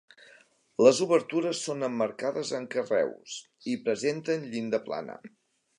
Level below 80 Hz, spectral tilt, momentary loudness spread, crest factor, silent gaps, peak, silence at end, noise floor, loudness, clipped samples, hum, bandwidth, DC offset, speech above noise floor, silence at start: -80 dBFS; -4.5 dB/octave; 16 LU; 22 dB; none; -6 dBFS; 0.5 s; -60 dBFS; -28 LUFS; under 0.1%; none; 11 kHz; under 0.1%; 32 dB; 0.8 s